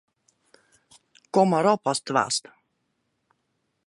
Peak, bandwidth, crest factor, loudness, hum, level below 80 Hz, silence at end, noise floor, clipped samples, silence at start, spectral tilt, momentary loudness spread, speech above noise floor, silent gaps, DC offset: -6 dBFS; 11.5 kHz; 22 dB; -23 LUFS; none; -76 dBFS; 1.45 s; -75 dBFS; under 0.1%; 1.35 s; -4.5 dB/octave; 7 LU; 53 dB; none; under 0.1%